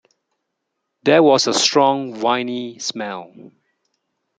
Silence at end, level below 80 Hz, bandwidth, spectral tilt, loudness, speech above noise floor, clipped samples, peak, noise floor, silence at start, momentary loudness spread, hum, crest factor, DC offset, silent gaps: 0.9 s; -68 dBFS; 9.6 kHz; -3 dB/octave; -17 LUFS; 59 dB; under 0.1%; -2 dBFS; -76 dBFS; 1.05 s; 14 LU; none; 18 dB; under 0.1%; none